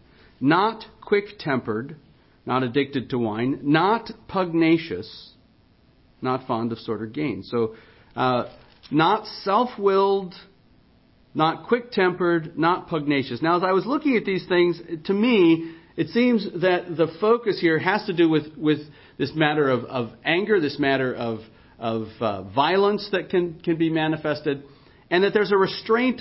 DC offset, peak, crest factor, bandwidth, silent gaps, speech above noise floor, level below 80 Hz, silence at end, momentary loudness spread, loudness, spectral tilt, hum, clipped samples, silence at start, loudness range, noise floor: under 0.1%; -6 dBFS; 18 dB; 5.8 kHz; none; 35 dB; -60 dBFS; 0 s; 10 LU; -23 LUFS; -10.5 dB/octave; none; under 0.1%; 0.4 s; 4 LU; -57 dBFS